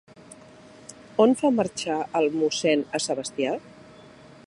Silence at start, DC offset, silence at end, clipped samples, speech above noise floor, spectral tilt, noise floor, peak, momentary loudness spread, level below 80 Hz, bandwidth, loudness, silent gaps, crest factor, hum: 0.3 s; under 0.1%; 0.75 s; under 0.1%; 25 dB; -4 dB/octave; -49 dBFS; -6 dBFS; 14 LU; -66 dBFS; 11.5 kHz; -24 LUFS; none; 20 dB; none